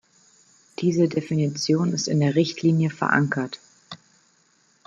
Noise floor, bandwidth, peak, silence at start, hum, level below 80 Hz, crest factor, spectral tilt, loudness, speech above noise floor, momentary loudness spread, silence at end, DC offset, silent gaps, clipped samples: -62 dBFS; 7.8 kHz; -4 dBFS; 0.8 s; none; -66 dBFS; 20 dB; -5.5 dB/octave; -23 LUFS; 41 dB; 21 LU; 0.9 s; under 0.1%; none; under 0.1%